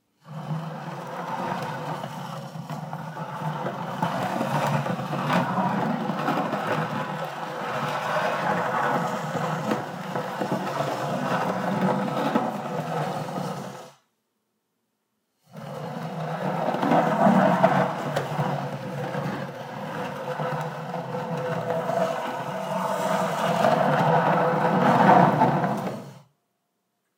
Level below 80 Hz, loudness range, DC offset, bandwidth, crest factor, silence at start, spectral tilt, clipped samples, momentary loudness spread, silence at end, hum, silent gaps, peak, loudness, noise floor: -70 dBFS; 11 LU; under 0.1%; 16 kHz; 22 dB; 0.25 s; -6.5 dB/octave; under 0.1%; 14 LU; 1 s; none; none; -4 dBFS; -26 LUFS; -76 dBFS